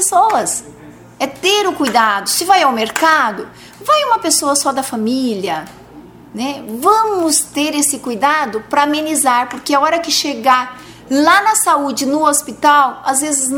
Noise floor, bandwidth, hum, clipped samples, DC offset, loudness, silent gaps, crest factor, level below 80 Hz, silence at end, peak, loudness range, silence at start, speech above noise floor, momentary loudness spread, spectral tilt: -38 dBFS; over 20 kHz; none; under 0.1%; under 0.1%; -14 LUFS; none; 14 dB; -56 dBFS; 0 s; 0 dBFS; 3 LU; 0 s; 23 dB; 11 LU; -1.5 dB/octave